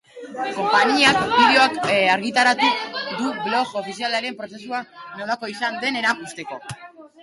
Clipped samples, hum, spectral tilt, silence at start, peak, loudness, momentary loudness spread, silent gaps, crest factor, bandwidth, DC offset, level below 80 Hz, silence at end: under 0.1%; none; -3 dB/octave; 0.15 s; -4 dBFS; -19 LUFS; 18 LU; none; 18 dB; 11.5 kHz; under 0.1%; -60 dBFS; 0.15 s